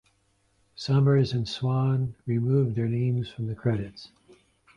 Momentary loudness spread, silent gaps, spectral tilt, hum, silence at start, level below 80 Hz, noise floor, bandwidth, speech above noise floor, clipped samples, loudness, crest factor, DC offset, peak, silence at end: 11 LU; none; -8 dB/octave; none; 0.8 s; -56 dBFS; -68 dBFS; 7.4 kHz; 43 dB; under 0.1%; -26 LUFS; 14 dB; under 0.1%; -12 dBFS; 0.7 s